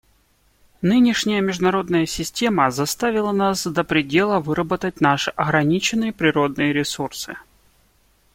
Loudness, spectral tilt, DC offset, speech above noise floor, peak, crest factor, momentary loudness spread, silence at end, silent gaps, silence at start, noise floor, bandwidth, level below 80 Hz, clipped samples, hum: -20 LUFS; -4.5 dB/octave; under 0.1%; 40 dB; -2 dBFS; 18 dB; 7 LU; 0.95 s; none; 0.8 s; -60 dBFS; 16.5 kHz; -50 dBFS; under 0.1%; none